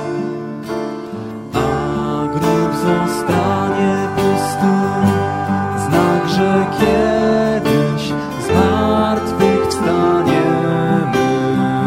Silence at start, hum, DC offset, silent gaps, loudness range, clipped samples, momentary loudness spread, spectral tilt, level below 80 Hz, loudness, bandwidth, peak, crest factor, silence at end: 0 s; none; under 0.1%; none; 3 LU; under 0.1%; 8 LU; -6.5 dB/octave; -40 dBFS; -16 LUFS; 16 kHz; 0 dBFS; 16 dB; 0 s